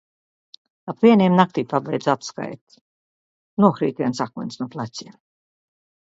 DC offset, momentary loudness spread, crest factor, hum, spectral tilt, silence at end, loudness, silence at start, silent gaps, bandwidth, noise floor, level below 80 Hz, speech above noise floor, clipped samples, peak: under 0.1%; 19 LU; 22 dB; none; -7 dB/octave; 1.1 s; -20 LUFS; 0.85 s; 2.61-2.67 s, 2.81-3.57 s; 7.8 kHz; under -90 dBFS; -68 dBFS; over 70 dB; under 0.1%; 0 dBFS